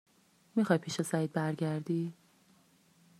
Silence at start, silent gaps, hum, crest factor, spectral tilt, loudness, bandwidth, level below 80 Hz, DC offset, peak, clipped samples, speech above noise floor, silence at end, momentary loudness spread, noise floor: 0.55 s; none; none; 22 dB; -6 dB/octave; -33 LUFS; 14 kHz; -80 dBFS; under 0.1%; -12 dBFS; under 0.1%; 34 dB; 1.1 s; 6 LU; -66 dBFS